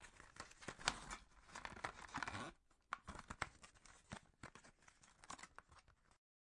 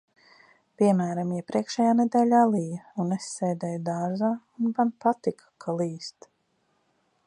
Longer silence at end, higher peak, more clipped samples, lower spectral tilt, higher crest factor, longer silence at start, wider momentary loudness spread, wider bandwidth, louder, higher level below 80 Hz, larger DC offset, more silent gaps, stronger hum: second, 0.35 s vs 1.15 s; second, -18 dBFS vs -8 dBFS; neither; second, -2 dB/octave vs -6.5 dB/octave; first, 36 dB vs 18 dB; second, 0 s vs 0.8 s; first, 22 LU vs 11 LU; first, 12 kHz vs 10.5 kHz; second, -51 LUFS vs -26 LUFS; first, -68 dBFS vs -76 dBFS; neither; neither; neither